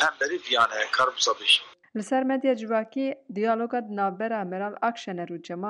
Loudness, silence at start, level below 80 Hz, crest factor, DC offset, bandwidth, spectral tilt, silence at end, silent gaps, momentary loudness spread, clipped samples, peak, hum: -25 LUFS; 0 s; -76 dBFS; 16 dB; under 0.1%; 11.5 kHz; -2.5 dB/octave; 0 s; none; 12 LU; under 0.1%; -10 dBFS; none